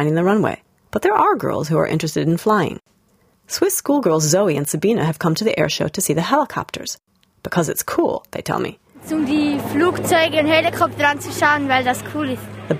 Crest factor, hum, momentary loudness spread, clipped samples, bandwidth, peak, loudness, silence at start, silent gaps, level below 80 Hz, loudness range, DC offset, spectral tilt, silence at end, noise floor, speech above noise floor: 18 dB; none; 10 LU; under 0.1%; 16 kHz; -2 dBFS; -18 LUFS; 0 s; none; -54 dBFS; 4 LU; under 0.1%; -4.5 dB/octave; 0 s; -58 dBFS; 40 dB